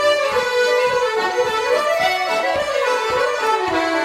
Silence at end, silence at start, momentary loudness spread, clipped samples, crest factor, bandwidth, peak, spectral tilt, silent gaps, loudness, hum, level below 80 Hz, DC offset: 0 s; 0 s; 2 LU; under 0.1%; 12 dB; 16 kHz; -6 dBFS; -2 dB/octave; none; -18 LUFS; none; -54 dBFS; under 0.1%